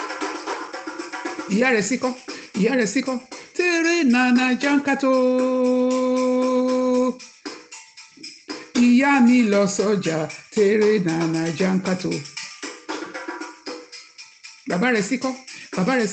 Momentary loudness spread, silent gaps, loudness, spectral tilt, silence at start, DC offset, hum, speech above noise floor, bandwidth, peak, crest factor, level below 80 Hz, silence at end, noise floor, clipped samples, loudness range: 18 LU; none; -20 LUFS; -5 dB/octave; 0 s; under 0.1%; none; 24 dB; 9 kHz; -6 dBFS; 16 dB; -66 dBFS; 0 s; -44 dBFS; under 0.1%; 8 LU